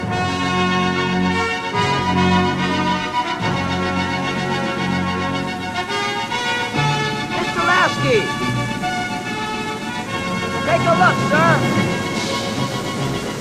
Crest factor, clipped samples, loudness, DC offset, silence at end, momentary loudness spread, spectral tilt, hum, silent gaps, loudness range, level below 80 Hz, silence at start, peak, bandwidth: 16 dB; under 0.1%; -19 LUFS; under 0.1%; 0 s; 8 LU; -5 dB/octave; none; none; 3 LU; -46 dBFS; 0 s; -2 dBFS; 13.5 kHz